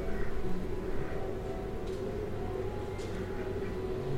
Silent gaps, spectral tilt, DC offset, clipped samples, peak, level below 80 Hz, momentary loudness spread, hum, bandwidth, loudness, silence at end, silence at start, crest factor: none; -7.5 dB/octave; under 0.1%; under 0.1%; -20 dBFS; -40 dBFS; 2 LU; none; 10.5 kHz; -38 LUFS; 0 s; 0 s; 14 dB